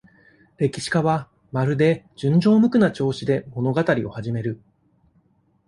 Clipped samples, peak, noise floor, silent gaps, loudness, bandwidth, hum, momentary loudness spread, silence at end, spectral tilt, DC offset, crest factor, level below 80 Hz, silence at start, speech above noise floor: under 0.1%; -6 dBFS; -62 dBFS; none; -21 LUFS; 11 kHz; none; 11 LU; 1.1 s; -7 dB/octave; under 0.1%; 16 dB; -56 dBFS; 0.6 s; 42 dB